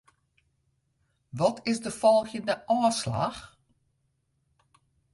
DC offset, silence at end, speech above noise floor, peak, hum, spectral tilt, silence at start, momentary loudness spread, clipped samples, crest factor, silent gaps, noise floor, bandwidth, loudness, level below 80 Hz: under 0.1%; 1.65 s; 48 dB; -10 dBFS; none; -5 dB/octave; 1.35 s; 10 LU; under 0.1%; 20 dB; none; -74 dBFS; 11.5 kHz; -27 LUFS; -62 dBFS